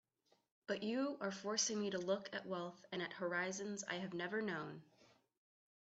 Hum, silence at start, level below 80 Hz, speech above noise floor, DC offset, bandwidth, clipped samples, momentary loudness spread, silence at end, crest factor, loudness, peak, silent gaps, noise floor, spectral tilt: none; 0.7 s; -86 dBFS; 29 dB; under 0.1%; 8.2 kHz; under 0.1%; 8 LU; 0.75 s; 20 dB; -42 LUFS; -24 dBFS; none; -72 dBFS; -3 dB/octave